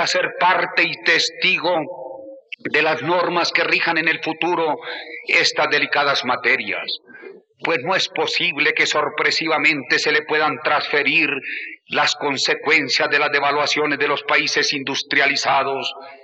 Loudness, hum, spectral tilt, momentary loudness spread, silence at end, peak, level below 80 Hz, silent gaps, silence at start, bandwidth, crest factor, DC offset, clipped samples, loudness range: -18 LUFS; none; -2 dB/octave; 9 LU; 0.1 s; -2 dBFS; -80 dBFS; none; 0 s; 8.6 kHz; 16 dB; under 0.1%; under 0.1%; 2 LU